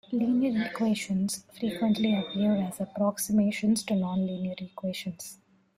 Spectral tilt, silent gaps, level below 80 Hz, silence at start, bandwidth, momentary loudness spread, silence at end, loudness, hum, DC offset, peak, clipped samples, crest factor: -5.5 dB/octave; none; -66 dBFS; 0.1 s; 16 kHz; 10 LU; 0.4 s; -29 LUFS; none; under 0.1%; -14 dBFS; under 0.1%; 14 dB